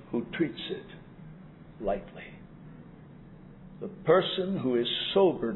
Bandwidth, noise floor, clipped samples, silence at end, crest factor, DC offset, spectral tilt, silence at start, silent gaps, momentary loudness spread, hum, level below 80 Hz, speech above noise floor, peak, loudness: 4.1 kHz; -49 dBFS; under 0.1%; 0 s; 20 dB; under 0.1%; -9 dB/octave; 0 s; none; 26 LU; none; -56 dBFS; 21 dB; -10 dBFS; -29 LUFS